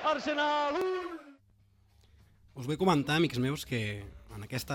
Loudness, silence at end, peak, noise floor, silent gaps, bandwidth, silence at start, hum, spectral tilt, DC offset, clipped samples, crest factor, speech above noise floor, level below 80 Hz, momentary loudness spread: -31 LUFS; 0 s; -14 dBFS; -65 dBFS; none; 17 kHz; 0 s; none; -5.5 dB/octave; under 0.1%; under 0.1%; 18 dB; 34 dB; -58 dBFS; 18 LU